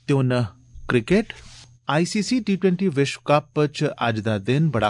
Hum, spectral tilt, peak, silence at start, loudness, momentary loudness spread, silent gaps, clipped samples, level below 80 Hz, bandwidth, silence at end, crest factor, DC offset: none; -6 dB/octave; -4 dBFS; 0.1 s; -22 LUFS; 5 LU; none; under 0.1%; -50 dBFS; 11 kHz; 0 s; 16 dB; under 0.1%